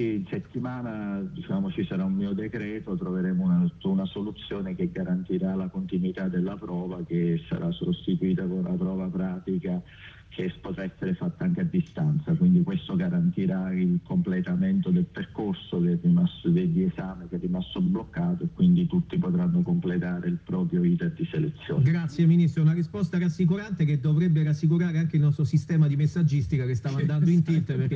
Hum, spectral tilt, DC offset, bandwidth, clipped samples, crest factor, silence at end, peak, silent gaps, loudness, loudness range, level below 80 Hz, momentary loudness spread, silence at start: none; -9 dB/octave; under 0.1%; 6.6 kHz; under 0.1%; 14 dB; 0 s; -12 dBFS; none; -26 LUFS; 6 LU; -54 dBFS; 10 LU; 0 s